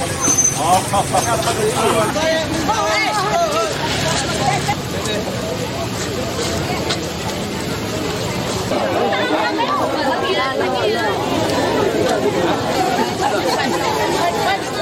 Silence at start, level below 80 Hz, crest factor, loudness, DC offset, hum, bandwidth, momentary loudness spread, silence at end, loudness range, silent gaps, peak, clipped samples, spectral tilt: 0 s; -40 dBFS; 14 dB; -18 LUFS; under 0.1%; none; 16.5 kHz; 6 LU; 0 s; 4 LU; none; -4 dBFS; under 0.1%; -3.5 dB/octave